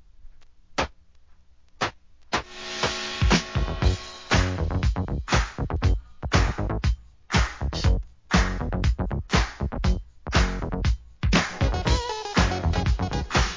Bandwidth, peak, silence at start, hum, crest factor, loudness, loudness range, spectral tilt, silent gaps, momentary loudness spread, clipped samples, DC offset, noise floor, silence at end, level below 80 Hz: 7.6 kHz; -6 dBFS; 0.2 s; none; 18 dB; -26 LUFS; 2 LU; -5 dB/octave; none; 7 LU; under 0.1%; 0.2%; -54 dBFS; 0 s; -28 dBFS